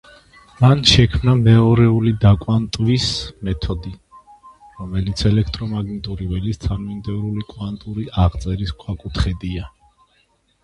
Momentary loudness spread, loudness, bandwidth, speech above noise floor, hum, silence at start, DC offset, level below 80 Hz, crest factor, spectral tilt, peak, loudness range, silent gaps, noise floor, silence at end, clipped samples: 15 LU; -18 LUFS; 11 kHz; 44 dB; none; 0.6 s; under 0.1%; -30 dBFS; 18 dB; -6 dB/octave; 0 dBFS; 9 LU; none; -61 dBFS; 0.95 s; under 0.1%